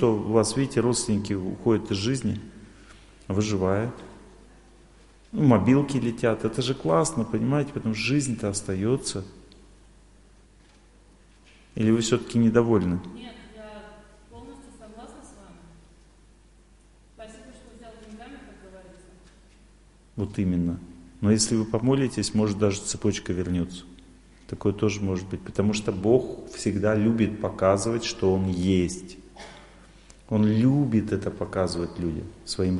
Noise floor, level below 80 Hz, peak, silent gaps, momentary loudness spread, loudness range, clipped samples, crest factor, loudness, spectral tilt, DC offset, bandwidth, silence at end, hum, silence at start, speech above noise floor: -55 dBFS; -46 dBFS; -4 dBFS; none; 23 LU; 8 LU; under 0.1%; 22 dB; -25 LUFS; -6 dB/octave; under 0.1%; 11.5 kHz; 0 s; none; 0 s; 31 dB